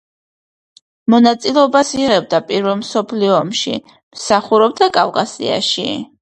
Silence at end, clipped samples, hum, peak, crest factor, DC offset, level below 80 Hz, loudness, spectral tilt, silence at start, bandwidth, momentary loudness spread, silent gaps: 0.15 s; under 0.1%; none; 0 dBFS; 16 dB; under 0.1%; -56 dBFS; -15 LUFS; -4 dB/octave; 1.1 s; 9.4 kHz; 8 LU; 4.03-4.11 s